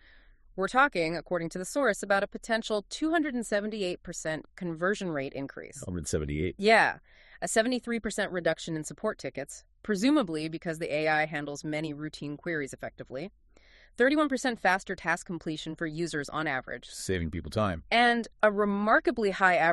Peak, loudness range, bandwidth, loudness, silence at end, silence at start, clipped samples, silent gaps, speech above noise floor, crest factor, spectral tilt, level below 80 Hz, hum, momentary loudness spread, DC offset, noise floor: -8 dBFS; 4 LU; 13 kHz; -29 LUFS; 0 s; 0.55 s; under 0.1%; none; 29 dB; 22 dB; -4.5 dB/octave; -54 dBFS; none; 13 LU; under 0.1%; -58 dBFS